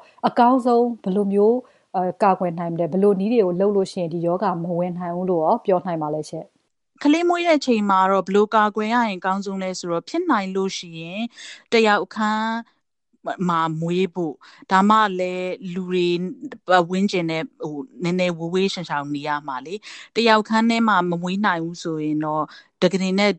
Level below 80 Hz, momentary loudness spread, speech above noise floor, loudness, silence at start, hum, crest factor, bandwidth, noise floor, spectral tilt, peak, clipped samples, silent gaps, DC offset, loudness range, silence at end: -70 dBFS; 12 LU; 48 dB; -21 LUFS; 0.25 s; none; 20 dB; 11 kHz; -69 dBFS; -6 dB/octave; 0 dBFS; under 0.1%; none; under 0.1%; 3 LU; 0 s